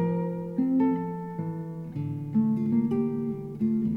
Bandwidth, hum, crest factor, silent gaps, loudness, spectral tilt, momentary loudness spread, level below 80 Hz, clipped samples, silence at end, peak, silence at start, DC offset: 3.2 kHz; none; 12 dB; none; -28 LUFS; -11 dB/octave; 9 LU; -62 dBFS; under 0.1%; 0 s; -14 dBFS; 0 s; under 0.1%